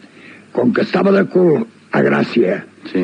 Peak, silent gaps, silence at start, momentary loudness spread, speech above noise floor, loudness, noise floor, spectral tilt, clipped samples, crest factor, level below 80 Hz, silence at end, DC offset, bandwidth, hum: -4 dBFS; none; 0.25 s; 9 LU; 26 dB; -15 LUFS; -41 dBFS; -8 dB/octave; under 0.1%; 12 dB; -64 dBFS; 0 s; under 0.1%; 8.6 kHz; none